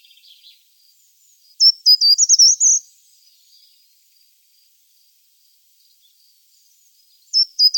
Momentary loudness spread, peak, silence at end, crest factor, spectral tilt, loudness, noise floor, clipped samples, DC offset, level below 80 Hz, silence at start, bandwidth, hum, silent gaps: 8 LU; -4 dBFS; 0 s; 16 dB; 14 dB/octave; -11 LUFS; -57 dBFS; under 0.1%; under 0.1%; under -90 dBFS; 1.6 s; 17.5 kHz; none; none